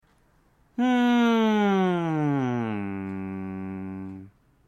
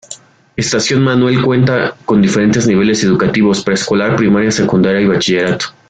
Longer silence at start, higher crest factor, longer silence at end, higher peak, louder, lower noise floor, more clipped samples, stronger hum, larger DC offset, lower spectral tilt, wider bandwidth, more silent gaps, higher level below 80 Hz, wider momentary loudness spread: first, 0.8 s vs 0.1 s; first, 16 dB vs 10 dB; first, 0.4 s vs 0.2 s; second, -10 dBFS vs -2 dBFS; second, -25 LUFS vs -12 LUFS; first, -62 dBFS vs -35 dBFS; neither; neither; neither; first, -7 dB/octave vs -5 dB/octave; first, 12.5 kHz vs 9.4 kHz; neither; second, -66 dBFS vs -44 dBFS; first, 16 LU vs 5 LU